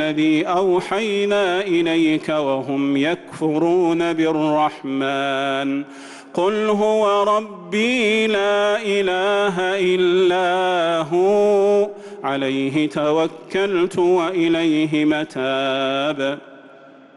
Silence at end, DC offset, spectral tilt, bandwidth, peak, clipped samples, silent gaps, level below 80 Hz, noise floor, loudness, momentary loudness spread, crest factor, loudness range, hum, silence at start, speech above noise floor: 0.5 s; under 0.1%; -5.5 dB/octave; 11.5 kHz; -8 dBFS; under 0.1%; none; -62 dBFS; -44 dBFS; -19 LUFS; 6 LU; 10 dB; 2 LU; none; 0 s; 26 dB